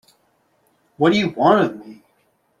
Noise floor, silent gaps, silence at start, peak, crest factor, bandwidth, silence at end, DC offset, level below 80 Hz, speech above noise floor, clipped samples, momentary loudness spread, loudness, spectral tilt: -64 dBFS; none; 1 s; -2 dBFS; 18 dB; 11.5 kHz; 0.65 s; under 0.1%; -62 dBFS; 47 dB; under 0.1%; 8 LU; -17 LUFS; -6.5 dB/octave